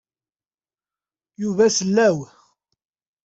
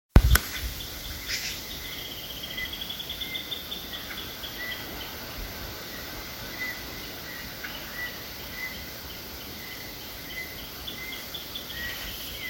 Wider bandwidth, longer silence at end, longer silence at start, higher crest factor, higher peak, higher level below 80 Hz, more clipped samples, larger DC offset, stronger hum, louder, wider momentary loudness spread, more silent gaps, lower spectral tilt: second, 8.2 kHz vs 17 kHz; first, 1 s vs 0 s; first, 1.4 s vs 0.15 s; second, 18 dB vs 32 dB; second, -6 dBFS vs 0 dBFS; second, -66 dBFS vs -36 dBFS; neither; neither; neither; first, -19 LUFS vs -32 LUFS; first, 12 LU vs 6 LU; neither; about the same, -4 dB/octave vs -3.5 dB/octave